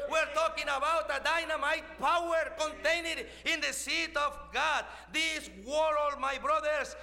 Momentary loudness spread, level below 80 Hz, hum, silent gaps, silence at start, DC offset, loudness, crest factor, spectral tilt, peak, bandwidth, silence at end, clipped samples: 4 LU; -56 dBFS; none; none; 0 s; under 0.1%; -31 LUFS; 14 dB; -1.5 dB/octave; -18 dBFS; 16.5 kHz; 0 s; under 0.1%